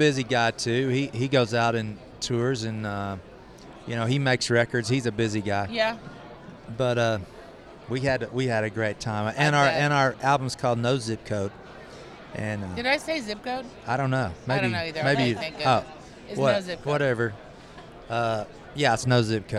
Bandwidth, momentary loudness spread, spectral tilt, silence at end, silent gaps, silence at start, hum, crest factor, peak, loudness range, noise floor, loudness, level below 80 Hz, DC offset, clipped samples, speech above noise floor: 12.5 kHz; 21 LU; -5 dB/octave; 0 s; none; 0 s; none; 18 dB; -8 dBFS; 4 LU; -45 dBFS; -26 LUFS; -54 dBFS; under 0.1%; under 0.1%; 20 dB